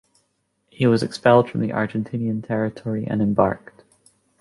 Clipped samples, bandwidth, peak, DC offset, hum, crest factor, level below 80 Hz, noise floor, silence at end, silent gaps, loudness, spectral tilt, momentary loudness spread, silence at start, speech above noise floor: under 0.1%; 11.5 kHz; -2 dBFS; under 0.1%; none; 20 dB; -54 dBFS; -70 dBFS; 0.85 s; none; -21 LUFS; -7.5 dB/octave; 9 LU; 0.8 s; 50 dB